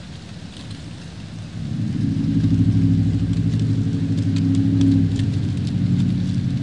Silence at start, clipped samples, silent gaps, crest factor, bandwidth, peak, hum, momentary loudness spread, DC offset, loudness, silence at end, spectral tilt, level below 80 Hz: 0 s; under 0.1%; none; 14 dB; 9.6 kHz; -6 dBFS; none; 17 LU; 0.4%; -20 LUFS; 0 s; -8 dB/octave; -38 dBFS